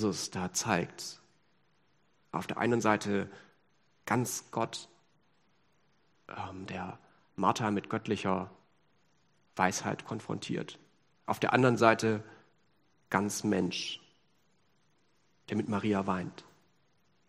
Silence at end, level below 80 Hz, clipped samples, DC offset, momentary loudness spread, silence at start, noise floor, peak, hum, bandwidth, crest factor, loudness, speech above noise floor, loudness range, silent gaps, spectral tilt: 0.85 s; -74 dBFS; under 0.1%; under 0.1%; 17 LU; 0 s; -73 dBFS; -6 dBFS; none; 14 kHz; 28 dB; -32 LUFS; 41 dB; 8 LU; none; -4.5 dB/octave